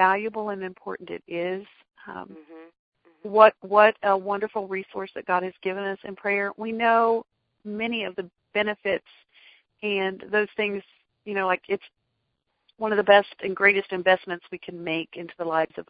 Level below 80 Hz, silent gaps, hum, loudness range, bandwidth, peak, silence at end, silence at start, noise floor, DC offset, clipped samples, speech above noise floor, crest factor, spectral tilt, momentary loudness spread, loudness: -70 dBFS; 2.79-2.92 s; none; 6 LU; 5 kHz; -2 dBFS; 0.05 s; 0 s; -77 dBFS; under 0.1%; under 0.1%; 52 dB; 22 dB; -9 dB/octave; 18 LU; -24 LUFS